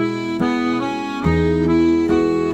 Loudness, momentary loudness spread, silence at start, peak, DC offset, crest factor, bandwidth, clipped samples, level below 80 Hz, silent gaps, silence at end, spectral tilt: -18 LUFS; 6 LU; 0 s; -4 dBFS; 0.1%; 12 dB; 8.4 kHz; under 0.1%; -38 dBFS; none; 0 s; -7.5 dB/octave